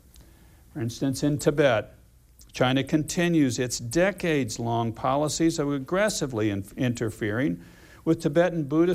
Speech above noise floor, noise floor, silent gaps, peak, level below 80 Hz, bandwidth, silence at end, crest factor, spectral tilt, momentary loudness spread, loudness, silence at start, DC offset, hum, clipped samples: 29 dB; -54 dBFS; none; -8 dBFS; -52 dBFS; 15.5 kHz; 0 s; 18 dB; -5.5 dB/octave; 7 LU; -25 LUFS; 0.2 s; under 0.1%; none; under 0.1%